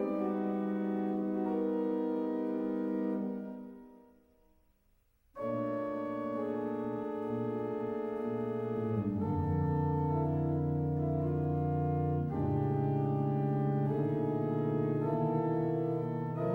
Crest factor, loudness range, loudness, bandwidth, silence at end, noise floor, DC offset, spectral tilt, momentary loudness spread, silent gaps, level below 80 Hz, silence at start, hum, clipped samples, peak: 14 dB; 7 LU; -34 LUFS; 4.1 kHz; 0 s; -71 dBFS; under 0.1%; -11 dB/octave; 5 LU; none; -58 dBFS; 0 s; none; under 0.1%; -20 dBFS